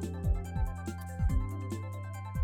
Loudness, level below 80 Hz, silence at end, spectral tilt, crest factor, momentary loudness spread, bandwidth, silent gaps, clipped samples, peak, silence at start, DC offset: -36 LUFS; -36 dBFS; 0 s; -7.5 dB/octave; 14 dB; 7 LU; 16 kHz; none; under 0.1%; -18 dBFS; 0 s; under 0.1%